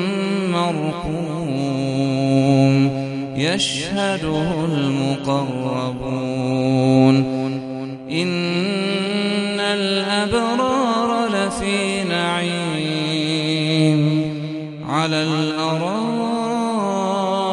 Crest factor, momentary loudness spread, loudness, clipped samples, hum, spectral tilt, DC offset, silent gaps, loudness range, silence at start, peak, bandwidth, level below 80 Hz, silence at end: 18 dB; 8 LU; -20 LUFS; under 0.1%; none; -5.5 dB/octave; under 0.1%; none; 2 LU; 0 s; 0 dBFS; 11.5 kHz; -48 dBFS; 0 s